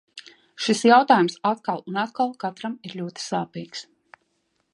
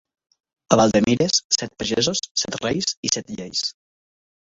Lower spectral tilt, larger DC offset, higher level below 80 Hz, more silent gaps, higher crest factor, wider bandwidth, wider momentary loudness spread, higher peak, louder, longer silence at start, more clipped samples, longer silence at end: first, -4.5 dB/octave vs -3 dB/octave; neither; second, -76 dBFS vs -52 dBFS; second, none vs 1.44-1.50 s, 2.31-2.35 s, 2.97-3.03 s; about the same, 22 dB vs 22 dB; first, 11.5 kHz vs 8 kHz; first, 19 LU vs 8 LU; about the same, -2 dBFS vs 0 dBFS; about the same, -23 LUFS vs -21 LUFS; second, 0.15 s vs 0.7 s; neither; about the same, 0.9 s vs 0.9 s